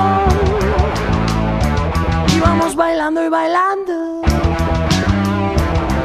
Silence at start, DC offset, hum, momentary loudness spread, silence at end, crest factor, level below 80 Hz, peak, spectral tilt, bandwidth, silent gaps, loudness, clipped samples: 0 s; under 0.1%; none; 4 LU; 0 s; 14 dB; -22 dBFS; 0 dBFS; -6 dB/octave; 14.5 kHz; none; -16 LUFS; under 0.1%